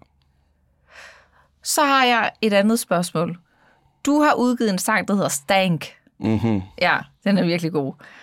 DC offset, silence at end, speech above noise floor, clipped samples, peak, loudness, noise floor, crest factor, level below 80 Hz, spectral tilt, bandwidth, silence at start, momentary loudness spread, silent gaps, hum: under 0.1%; 0.3 s; 43 dB; under 0.1%; -4 dBFS; -20 LUFS; -62 dBFS; 18 dB; -60 dBFS; -4.5 dB/octave; 17 kHz; 0.95 s; 11 LU; none; none